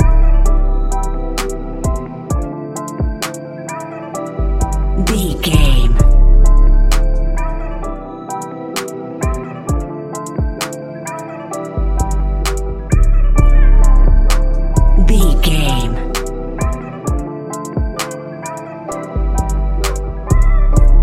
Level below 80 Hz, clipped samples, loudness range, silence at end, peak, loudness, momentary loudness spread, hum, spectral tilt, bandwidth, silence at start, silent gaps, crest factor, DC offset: -12 dBFS; under 0.1%; 8 LU; 0 s; 0 dBFS; -18 LUFS; 12 LU; none; -5.5 dB/octave; 14 kHz; 0 s; none; 12 dB; under 0.1%